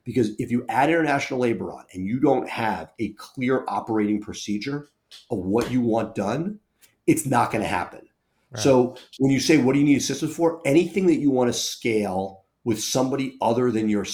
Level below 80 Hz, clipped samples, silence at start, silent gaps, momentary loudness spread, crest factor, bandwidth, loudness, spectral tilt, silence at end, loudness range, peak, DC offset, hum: -58 dBFS; under 0.1%; 0.05 s; none; 12 LU; 18 dB; 19 kHz; -23 LUFS; -5 dB/octave; 0 s; 5 LU; -4 dBFS; under 0.1%; none